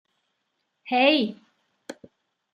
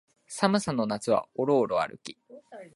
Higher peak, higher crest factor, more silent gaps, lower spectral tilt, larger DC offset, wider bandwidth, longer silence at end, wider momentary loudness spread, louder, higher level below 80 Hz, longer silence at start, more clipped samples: about the same, -4 dBFS vs -6 dBFS; about the same, 24 dB vs 22 dB; neither; about the same, -4.5 dB/octave vs -5 dB/octave; neither; about the same, 11.5 kHz vs 11.5 kHz; first, 0.6 s vs 0.1 s; first, 24 LU vs 19 LU; first, -22 LUFS vs -27 LUFS; second, -82 dBFS vs -66 dBFS; first, 0.85 s vs 0.3 s; neither